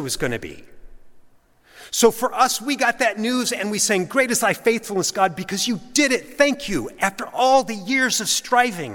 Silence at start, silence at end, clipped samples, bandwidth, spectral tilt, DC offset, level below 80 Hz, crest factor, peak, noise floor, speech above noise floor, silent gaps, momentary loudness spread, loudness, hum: 0 s; 0 s; under 0.1%; 17.5 kHz; -2.5 dB/octave; under 0.1%; -50 dBFS; 20 dB; -2 dBFS; -53 dBFS; 32 dB; none; 6 LU; -20 LUFS; none